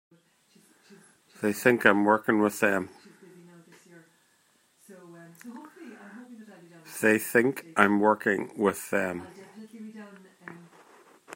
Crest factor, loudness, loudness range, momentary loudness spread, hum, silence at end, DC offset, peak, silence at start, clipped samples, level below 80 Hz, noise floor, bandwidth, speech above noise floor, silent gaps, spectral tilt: 26 dB; -25 LUFS; 7 LU; 25 LU; none; 0 s; under 0.1%; -2 dBFS; 1.4 s; under 0.1%; -76 dBFS; -66 dBFS; 16 kHz; 42 dB; none; -5 dB/octave